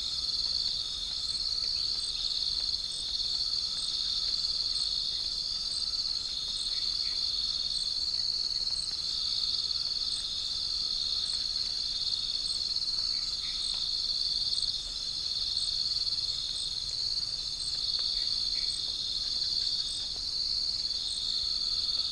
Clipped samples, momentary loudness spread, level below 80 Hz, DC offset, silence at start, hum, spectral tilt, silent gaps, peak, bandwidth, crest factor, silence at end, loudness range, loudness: under 0.1%; 3 LU; -52 dBFS; under 0.1%; 0 s; none; 0.5 dB/octave; none; -16 dBFS; 10.5 kHz; 16 dB; 0 s; 1 LU; -29 LUFS